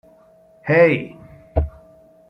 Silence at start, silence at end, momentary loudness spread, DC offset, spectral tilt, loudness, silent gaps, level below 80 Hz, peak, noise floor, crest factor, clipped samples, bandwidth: 0.65 s; 0.6 s; 18 LU; under 0.1%; -9 dB/octave; -19 LUFS; none; -34 dBFS; -2 dBFS; -51 dBFS; 18 dB; under 0.1%; 5.4 kHz